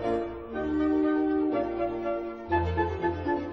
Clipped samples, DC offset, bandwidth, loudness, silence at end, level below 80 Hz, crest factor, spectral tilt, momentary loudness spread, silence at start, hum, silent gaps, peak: under 0.1%; under 0.1%; 6 kHz; -29 LUFS; 0 s; -46 dBFS; 14 dB; -9 dB/octave; 7 LU; 0 s; none; none; -14 dBFS